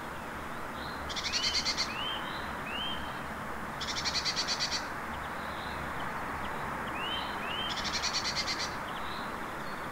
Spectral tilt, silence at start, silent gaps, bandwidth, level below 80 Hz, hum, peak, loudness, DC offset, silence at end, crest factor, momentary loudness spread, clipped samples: -2 dB/octave; 0 s; none; 16 kHz; -52 dBFS; none; -18 dBFS; -34 LUFS; 0.1%; 0 s; 18 dB; 9 LU; under 0.1%